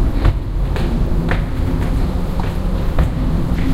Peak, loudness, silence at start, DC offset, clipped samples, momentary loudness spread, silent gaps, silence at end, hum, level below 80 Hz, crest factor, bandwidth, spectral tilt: -2 dBFS; -20 LUFS; 0 s; under 0.1%; under 0.1%; 3 LU; none; 0 s; none; -18 dBFS; 14 dB; 13.5 kHz; -7.5 dB/octave